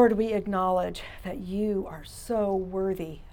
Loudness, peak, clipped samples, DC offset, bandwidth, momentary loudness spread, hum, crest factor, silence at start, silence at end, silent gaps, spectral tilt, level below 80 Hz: -29 LUFS; -8 dBFS; under 0.1%; under 0.1%; 18 kHz; 12 LU; none; 20 dB; 0 s; 0 s; none; -6.5 dB/octave; -48 dBFS